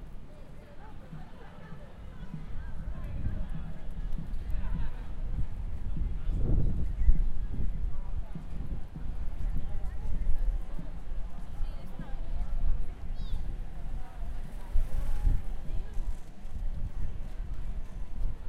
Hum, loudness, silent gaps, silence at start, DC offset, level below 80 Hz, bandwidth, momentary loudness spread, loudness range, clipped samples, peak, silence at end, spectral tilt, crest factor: none; -39 LUFS; none; 0 s; under 0.1%; -32 dBFS; 3.8 kHz; 13 LU; 7 LU; under 0.1%; -8 dBFS; 0 s; -8 dB/octave; 20 dB